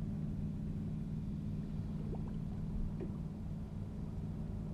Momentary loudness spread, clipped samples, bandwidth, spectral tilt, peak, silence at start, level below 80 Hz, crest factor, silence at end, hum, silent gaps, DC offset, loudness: 3 LU; under 0.1%; 8.6 kHz; -9.5 dB/octave; -28 dBFS; 0 s; -46 dBFS; 12 dB; 0 s; none; none; under 0.1%; -42 LUFS